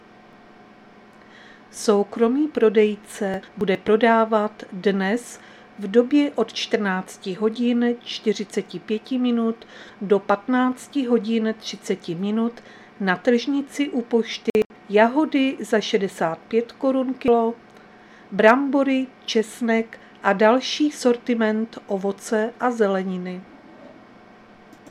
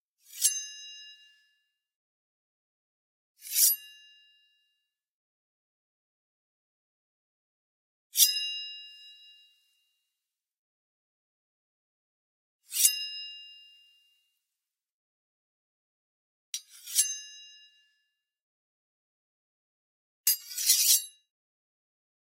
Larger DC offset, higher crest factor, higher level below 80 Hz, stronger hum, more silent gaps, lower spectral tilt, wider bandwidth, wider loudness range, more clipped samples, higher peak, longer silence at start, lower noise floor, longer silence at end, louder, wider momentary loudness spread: neither; second, 22 dB vs 30 dB; first, -64 dBFS vs under -90 dBFS; neither; second, 14.50-14.54 s, 14.66-14.70 s vs 1.96-3.35 s, 5.10-8.10 s, 10.57-12.59 s, 14.90-16.53 s, 18.41-20.24 s; first, -5 dB/octave vs 12 dB/octave; second, 13.5 kHz vs 16 kHz; second, 3 LU vs 12 LU; neither; first, 0 dBFS vs -6 dBFS; first, 1.75 s vs 0.35 s; second, -48 dBFS vs -89 dBFS; second, 1 s vs 1.25 s; first, -22 LUFS vs -25 LUFS; second, 11 LU vs 23 LU